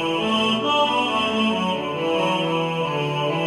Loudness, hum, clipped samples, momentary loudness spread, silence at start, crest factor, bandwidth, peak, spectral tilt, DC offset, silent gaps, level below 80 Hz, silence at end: -21 LUFS; none; under 0.1%; 4 LU; 0 s; 14 dB; 13 kHz; -6 dBFS; -5 dB/octave; under 0.1%; none; -60 dBFS; 0 s